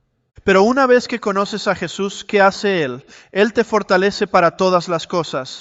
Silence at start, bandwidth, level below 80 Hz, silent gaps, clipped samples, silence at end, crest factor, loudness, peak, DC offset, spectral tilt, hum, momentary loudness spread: 0.45 s; 8 kHz; -52 dBFS; none; under 0.1%; 0 s; 16 dB; -17 LUFS; -2 dBFS; under 0.1%; -5 dB/octave; none; 10 LU